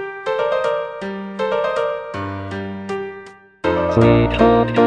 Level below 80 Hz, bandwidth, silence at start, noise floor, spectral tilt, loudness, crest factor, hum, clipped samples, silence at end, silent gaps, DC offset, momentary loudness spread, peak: -36 dBFS; 9.4 kHz; 0 s; -39 dBFS; -7.5 dB/octave; -19 LUFS; 18 dB; none; under 0.1%; 0 s; none; under 0.1%; 14 LU; 0 dBFS